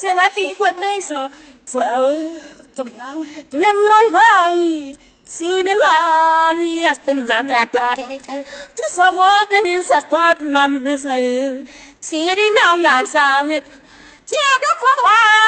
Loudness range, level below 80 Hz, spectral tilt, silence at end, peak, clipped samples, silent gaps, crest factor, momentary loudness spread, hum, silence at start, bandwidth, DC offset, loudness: 3 LU; -62 dBFS; -1 dB/octave; 0 s; 0 dBFS; under 0.1%; none; 16 dB; 17 LU; none; 0 s; 9.4 kHz; under 0.1%; -14 LUFS